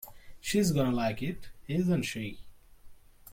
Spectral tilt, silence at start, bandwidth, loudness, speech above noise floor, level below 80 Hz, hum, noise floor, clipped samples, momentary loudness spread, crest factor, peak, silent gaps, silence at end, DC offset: -5.5 dB/octave; 0 s; 16.5 kHz; -31 LUFS; 21 dB; -52 dBFS; none; -51 dBFS; under 0.1%; 14 LU; 16 dB; -16 dBFS; none; 0 s; under 0.1%